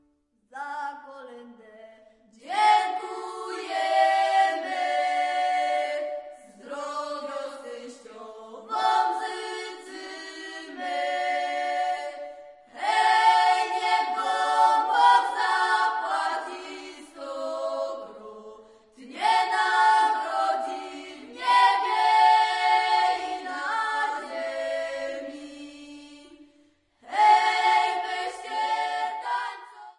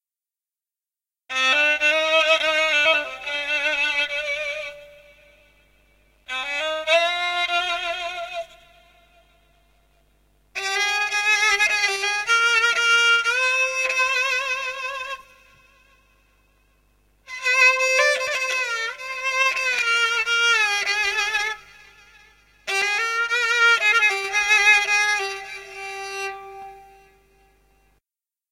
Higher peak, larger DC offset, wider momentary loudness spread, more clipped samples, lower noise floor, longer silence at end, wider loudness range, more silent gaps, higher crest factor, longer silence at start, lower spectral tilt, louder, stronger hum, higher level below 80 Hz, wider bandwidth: second, -8 dBFS vs -4 dBFS; neither; first, 22 LU vs 15 LU; neither; second, -68 dBFS vs under -90 dBFS; second, 0.1 s vs 1.7 s; about the same, 9 LU vs 9 LU; neither; about the same, 18 dB vs 20 dB; second, 0.55 s vs 1.3 s; first, 0 dB/octave vs 1.5 dB/octave; second, -24 LUFS vs -19 LUFS; second, none vs 50 Hz at -65 dBFS; second, -76 dBFS vs -60 dBFS; second, 11.5 kHz vs 16 kHz